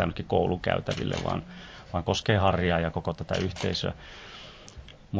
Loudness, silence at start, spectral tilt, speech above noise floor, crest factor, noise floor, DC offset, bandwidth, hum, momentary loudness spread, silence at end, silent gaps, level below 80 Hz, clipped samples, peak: -28 LUFS; 0 s; -6 dB/octave; 19 dB; 22 dB; -47 dBFS; under 0.1%; 8 kHz; none; 20 LU; 0 s; none; -44 dBFS; under 0.1%; -8 dBFS